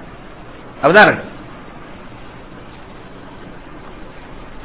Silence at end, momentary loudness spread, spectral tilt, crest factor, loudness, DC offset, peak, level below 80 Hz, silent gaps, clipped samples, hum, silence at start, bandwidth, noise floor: 0.05 s; 27 LU; -9 dB/octave; 20 dB; -11 LUFS; 0.8%; 0 dBFS; -44 dBFS; none; 0.3%; none; 0.8 s; 4 kHz; -36 dBFS